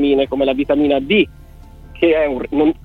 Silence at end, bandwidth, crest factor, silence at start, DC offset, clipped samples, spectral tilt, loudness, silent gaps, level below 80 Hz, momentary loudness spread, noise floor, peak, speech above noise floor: 0.05 s; 4.5 kHz; 14 dB; 0 s; 0.1%; under 0.1%; -7.5 dB/octave; -16 LUFS; none; -40 dBFS; 4 LU; -38 dBFS; -2 dBFS; 23 dB